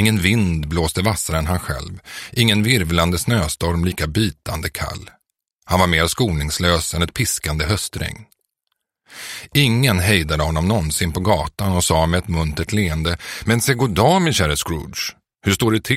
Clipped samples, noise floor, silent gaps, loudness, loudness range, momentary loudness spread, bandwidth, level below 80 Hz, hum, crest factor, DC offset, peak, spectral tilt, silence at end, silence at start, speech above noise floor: under 0.1%; -76 dBFS; 5.53-5.59 s; -19 LUFS; 3 LU; 11 LU; 16.5 kHz; -32 dBFS; none; 18 dB; under 0.1%; 0 dBFS; -4.5 dB/octave; 0 s; 0 s; 57 dB